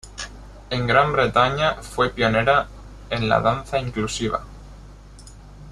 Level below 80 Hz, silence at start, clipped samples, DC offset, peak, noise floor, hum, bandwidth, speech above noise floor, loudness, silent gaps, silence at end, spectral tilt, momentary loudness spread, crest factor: -40 dBFS; 0.05 s; under 0.1%; under 0.1%; -2 dBFS; -42 dBFS; 50 Hz at -40 dBFS; 13 kHz; 22 dB; -21 LUFS; none; 0 s; -5 dB/octave; 16 LU; 20 dB